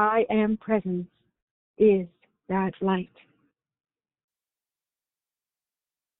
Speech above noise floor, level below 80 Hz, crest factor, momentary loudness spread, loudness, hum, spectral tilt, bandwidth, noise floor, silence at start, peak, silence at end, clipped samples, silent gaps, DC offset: over 66 dB; -62 dBFS; 18 dB; 16 LU; -25 LUFS; none; -6.5 dB/octave; 3.9 kHz; under -90 dBFS; 0 s; -10 dBFS; 3.15 s; under 0.1%; 1.42-1.74 s; under 0.1%